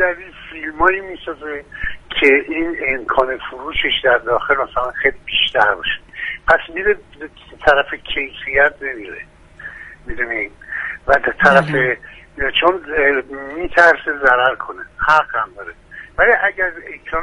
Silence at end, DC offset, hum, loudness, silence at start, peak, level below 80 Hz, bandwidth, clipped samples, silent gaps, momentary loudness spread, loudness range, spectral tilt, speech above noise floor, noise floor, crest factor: 0 s; under 0.1%; none; -16 LUFS; 0 s; 0 dBFS; -40 dBFS; 11 kHz; under 0.1%; none; 18 LU; 4 LU; -5 dB/octave; 19 dB; -36 dBFS; 18 dB